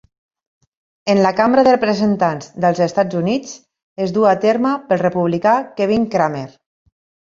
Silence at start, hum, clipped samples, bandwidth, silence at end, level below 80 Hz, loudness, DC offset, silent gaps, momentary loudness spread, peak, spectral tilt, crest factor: 1.05 s; none; under 0.1%; 7.6 kHz; 0.8 s; -56 dBFS; -16 LUFS; under 0.1%; 3.83-3.96 s; 10 LU; 0 dBFS; -6.5 dB/octave; 16 dB